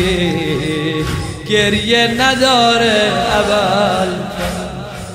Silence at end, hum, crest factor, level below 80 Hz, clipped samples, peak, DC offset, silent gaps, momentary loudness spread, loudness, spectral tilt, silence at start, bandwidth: 0 s; none; 14 dB; -34 dBFS; under 0.1%; 0 dBFS; under 0.1%; none; 10 LU; -14 LUFS; -4 dB/octave; 0 s; 16 kHz